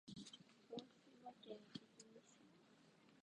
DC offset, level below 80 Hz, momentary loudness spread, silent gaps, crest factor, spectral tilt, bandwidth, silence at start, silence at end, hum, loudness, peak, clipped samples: under 0.1%; under -90 dBFS; 10 LU; none; 24 dB; -4.5 dB/octave; 10 kHz; 0.05 s; 0 s; none; -60 LUFS; -38 dBFS; under 0.1%